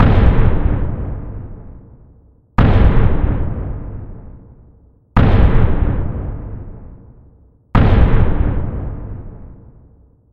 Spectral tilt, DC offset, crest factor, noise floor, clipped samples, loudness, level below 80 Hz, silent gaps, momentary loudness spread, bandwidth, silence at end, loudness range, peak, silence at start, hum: -10 dB/octave; under 0.1%; 14 dB; -48 dBFS; under 0.1%; -17 LUFS; -18 dBFS; none; 21 LU; 4.6 kHz; 0.8 s; 2 LU; 0 dBFS; 0 s; none